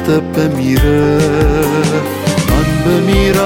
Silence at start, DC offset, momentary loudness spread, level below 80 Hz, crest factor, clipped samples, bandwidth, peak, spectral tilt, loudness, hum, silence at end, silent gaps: 0 s; under 0.1%; 4 LU; -20 dBFS; 10 dB; under 0.1%; 17 kHz; -2 dBFS; -6 dB/octave; -12 LUFS; none; 0 s; none